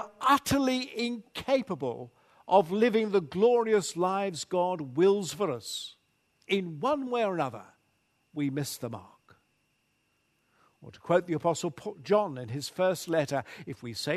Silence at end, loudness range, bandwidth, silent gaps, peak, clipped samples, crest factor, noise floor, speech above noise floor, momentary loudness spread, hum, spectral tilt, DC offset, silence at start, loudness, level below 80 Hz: 0 s; 8 LU; 13.5 kHz; none; -10 dBFS; under 0.1%; 20 dB; -74 dBFS; 45 dB; 14 LU; none; -5 dB/octave; under 0.1%; 0 s; -29 LUFS; -66 dBFS